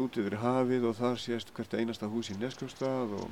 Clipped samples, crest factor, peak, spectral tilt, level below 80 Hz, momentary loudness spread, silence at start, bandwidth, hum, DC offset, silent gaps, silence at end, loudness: under 0.1%; 18 dB; -16 dBFS; -6 dB/octave; -68 dBFS; 8 LU; 0 s; 15 kHz; none; 0.1%; none; 0 s; -33 LUFS